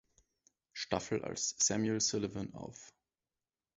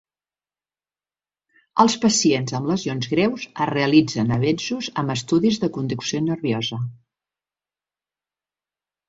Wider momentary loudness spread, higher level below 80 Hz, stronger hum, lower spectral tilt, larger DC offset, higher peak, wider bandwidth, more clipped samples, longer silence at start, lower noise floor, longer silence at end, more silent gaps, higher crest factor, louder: first, 18 LU vs 8 LU; second, -66 dBFS vs -58 dBFS; second, none vs 50 Hz at -50 dBFS; about the same, -4 dB/octave vs -5 dB/octave; neither; second, -16 dBFS vs -2 dBFS; about the same, 8 kHz vs 8 kHz; neither; second, 0.75 s vs 1.75 s; about the same, under -90 dBFS vs under -90 dBFS; second, 0.9 s vs 2.15 s; neither; about the same, 22 dB vs 22 dB; second, -35 LUFS vs -21 LUFS